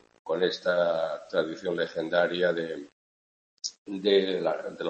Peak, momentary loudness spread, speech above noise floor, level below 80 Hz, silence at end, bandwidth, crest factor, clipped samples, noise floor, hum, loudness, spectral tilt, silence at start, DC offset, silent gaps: -10 dBFS; 12 LU; over 63 dB; -74 dBFS; 0 s; 8.6 kHz; 18 dB; under 0.1%; under -90 dBFS; none; -28 LUFS; -4 dB/octave; 0.25 s; under 0.1%; 2.92-3.57 s, 3.78-3.86 s